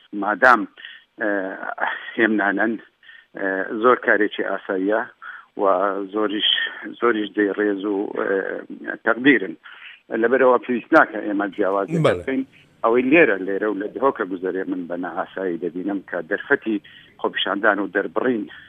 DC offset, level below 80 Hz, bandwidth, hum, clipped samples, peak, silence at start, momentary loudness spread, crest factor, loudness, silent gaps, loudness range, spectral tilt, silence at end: under 0.1%; -68 dBFS; 9.4 kHz; none; under 0.1%; 0 dBFS; 0.15 s; 12 LU; 22 dB; -21 LUFS; none; 5 LU; -6.5 dB/octave; 0.1 s